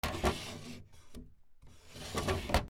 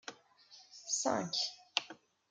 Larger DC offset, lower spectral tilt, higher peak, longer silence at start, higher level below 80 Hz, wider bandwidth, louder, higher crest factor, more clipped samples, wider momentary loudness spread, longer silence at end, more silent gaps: neither; first, -4.5 dB/octave vs -1.5 dB/octave; about the same, -14 dBFS vs -12 dBFS; about the same, 0.05 s vs 0.05 s; first, -46 dBFS vs under -90 dBFS; first, 19.5 kHz vs 12 kHz; about the same, -37 LUFS vs -36 LUFS; about the same, 24 dB vs 28 dB; neither; about the same, 21 LU vs 21 LU; second, 0 s vs 0.35 s; neither